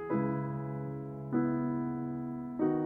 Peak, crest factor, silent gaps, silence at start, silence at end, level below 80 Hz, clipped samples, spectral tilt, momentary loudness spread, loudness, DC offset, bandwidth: -20 dBFS; 14 dB; none; 0 s; 0 s; -64 dBFS; under 0.1%; -12 dB/octave; 7 LU; -35 LUFS; under 0.1%; 3.2 kHz